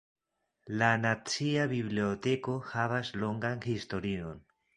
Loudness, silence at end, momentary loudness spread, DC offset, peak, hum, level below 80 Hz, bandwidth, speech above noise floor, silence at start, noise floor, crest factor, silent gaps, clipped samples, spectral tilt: -32 LUFS; 0.4 s; 9 LU; under 0.1%; -10 dBFS; none; -60 dBFS; 11.5 kHz; 49 dB; 0.65 s; -81 dBFS; 22 dB; none; under 0.1%; -5.5 dB/octave